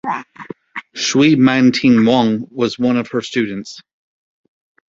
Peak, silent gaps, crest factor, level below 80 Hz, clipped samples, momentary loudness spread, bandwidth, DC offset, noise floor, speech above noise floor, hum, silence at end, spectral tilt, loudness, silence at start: 0 dBFS; none; 16 dB; -56 dBFS; under 0.1%; 19 LU; 7.8 kHz; under 0.1%; -35 dBFS; 21 dB; none; 1.1 s; -5 dB/octave; -15 LUFS; 0.05 s